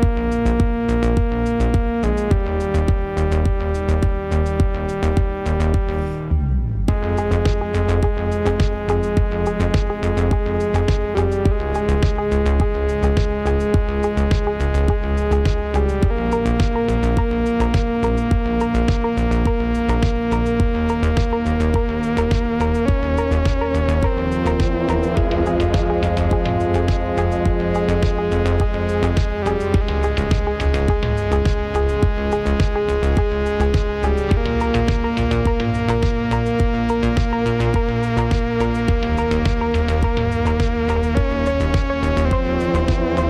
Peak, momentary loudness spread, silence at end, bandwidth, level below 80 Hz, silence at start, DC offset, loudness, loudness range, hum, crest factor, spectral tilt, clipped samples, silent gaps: -4 dBFS; 2 LU; 0 s; 10.5 kHz; -22 dBFS; 0 s; under 0.1%; -19 LUFS; 1 LU; none; 14 dB; -7.5 dB/octave; under 0.1%; none